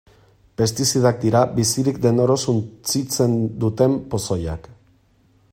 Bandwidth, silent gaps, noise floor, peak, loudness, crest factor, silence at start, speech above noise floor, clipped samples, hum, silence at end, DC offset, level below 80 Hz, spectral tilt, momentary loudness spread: 16 kHz; none; -58 dBFS; -2 dBFS; -20 LUFS; 18 dB; 0.6 s; 38 dB; under 0.1%; none; 0.8 s; under 0.1%; -48 dBFS; -5.5 dB/octave; 7 LU